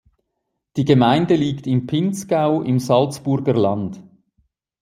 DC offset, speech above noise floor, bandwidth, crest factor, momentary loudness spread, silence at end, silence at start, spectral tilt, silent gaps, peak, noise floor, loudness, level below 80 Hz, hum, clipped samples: under 0.1%; 59 dB; 15.5 kHz; 18 dB; 8 LU; 0.8 s; 0.75 s; -7 dB/octave; none; -2 dBFS; -76 dBFS; -18 LUFS; -56 dBFS; none; under 0.1%